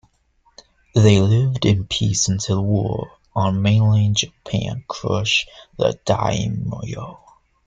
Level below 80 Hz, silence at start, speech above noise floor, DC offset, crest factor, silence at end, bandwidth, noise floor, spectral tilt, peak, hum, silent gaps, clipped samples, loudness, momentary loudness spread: -44 dBFS; 0.95 s; 42 dB; under 0.1%; 18 dB; 0.55 s; 9 kHz; -61 dBFS; -5 dB/octave; -2 dBFS; none; none; under 0.1%; -19 LUFS; 12 LU